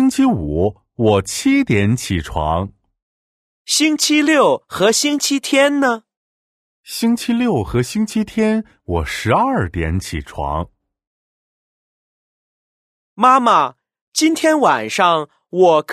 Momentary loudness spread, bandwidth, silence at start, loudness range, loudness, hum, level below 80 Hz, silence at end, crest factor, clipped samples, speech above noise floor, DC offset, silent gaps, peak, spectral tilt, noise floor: 10 LU; 15.5 kHz; 0 s; 7 LU; -16 LUFS; none; -38 dBFS; 0 s; 18 dB; under 0.1%; over 74 dB; under 0.1%; 3.02-3.65 s, 6.17-6.83 s, 11.07-13.16 s, 14.01-14.12 s; 0 dBFS; -4.5 dB/octave; under -90 dBFS